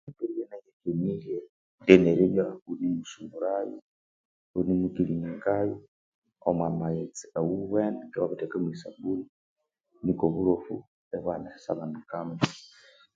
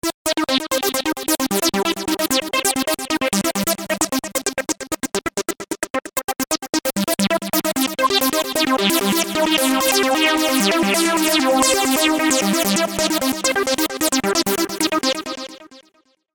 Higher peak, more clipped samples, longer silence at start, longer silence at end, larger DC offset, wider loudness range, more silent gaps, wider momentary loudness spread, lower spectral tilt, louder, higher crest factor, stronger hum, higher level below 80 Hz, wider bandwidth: about the same, -2 dBFS vs 0 dBFS; neither; about the same, 0.05 s vs 0.05 s; about the same, 0.5 s vs 0.55 s; neither; about the same, 6 LU vs 6 LU; first, 0.73-0.80 s, 1.49-1.78 s, 3.82-4.54 s, 5.88-6.22 s, 9.29-9.56 s, 10.87-11.11 s vs 0.14-0.25 s, 5.90-5.94 s, 6.24-6.28 s, 6.69-6.73 s; first, 13 LU vs 8 LU; first, -7 dB/octave vs -2.5 dB/octave; second, -29 LUFS vs -18 LUFS; first, 28 dB vs 20 dB; neither; second, -60 dBFS vs -52 dBFS; second, 7.8 kHz vs 19.5 kHz